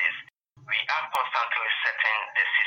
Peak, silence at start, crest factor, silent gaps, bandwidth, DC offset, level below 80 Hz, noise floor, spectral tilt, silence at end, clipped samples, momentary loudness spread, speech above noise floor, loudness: -12 dBFS; 0 s; 16 dB; none; 16.5 kHz; under 0.1%; -80 dBFS; -50 dBFS; 0 dB/octave; 0 s; under 0.1%; 4 LU; 24 dB; -25 LUFS